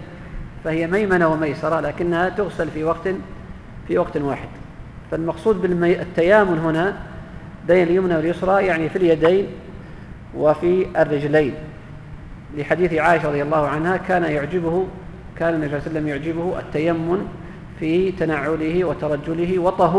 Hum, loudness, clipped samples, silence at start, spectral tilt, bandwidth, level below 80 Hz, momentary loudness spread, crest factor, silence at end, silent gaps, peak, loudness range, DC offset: none; -20 LUFS; under 0.1%; 0 s; -8 dB/octave; 11 kHz; -42 dBFS; 20 LU; 18 dB; 0 s; none; -2 dBFS; 5 LU; under 0.1%